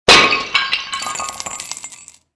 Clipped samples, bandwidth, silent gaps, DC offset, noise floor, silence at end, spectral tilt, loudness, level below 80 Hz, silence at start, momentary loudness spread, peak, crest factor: under 0.1%; 11 kHz; none; under 0.1%; -40 dBFS; 0.3 s; -1 dB/octave; -15 LUFS; -44 dBFS; 0.05 s; 19 LU; 0 dBFS; 18 dB